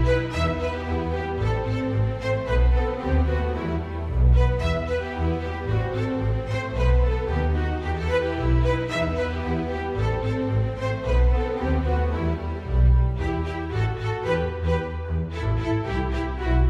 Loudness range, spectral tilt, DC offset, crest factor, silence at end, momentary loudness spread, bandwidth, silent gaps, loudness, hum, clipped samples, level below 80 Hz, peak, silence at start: 1 LU; -8 dB/octave; under 0.1%; 16 dB; 0 s; 6 LU; 7.8 kHz; none; -25 LUFS; none; under 0.1%; -26 dBFS; -8 dBFS; 0 s